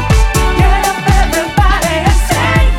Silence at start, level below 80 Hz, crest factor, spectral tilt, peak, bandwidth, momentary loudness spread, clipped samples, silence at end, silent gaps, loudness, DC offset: 0 s; -12 dBFS; 10 dB; -4.5 dB/octave; 0 dBFS; 16.5 kHz; 1 LU; under 0.1%; 0 s; none; -12 LUFS; under 0.1%